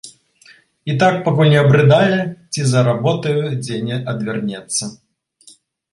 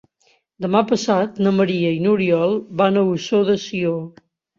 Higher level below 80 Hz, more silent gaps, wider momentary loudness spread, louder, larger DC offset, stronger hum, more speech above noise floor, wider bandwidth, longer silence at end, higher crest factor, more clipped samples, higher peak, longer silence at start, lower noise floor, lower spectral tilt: first, -54 dBFS vs -60 dBFS; neither; first, 12 LU vs 6 LU; first, -16 LUFS vs -19 LUFS; neither; neither; second, 34 dB vs 43 dB; first, 11.5 kHz vs 7.6 kHz; first, 1 s vs 0.5 s; about the same, 16 dB vs 16 dB; neither; about the same, 0 dBFS vs -2 dBFS; second, 0.05 s vs 0.6 s; second, -49 dBFS vs -61 dBFS; about the same, -5.5 dB/octave vs -6.5 dB/octave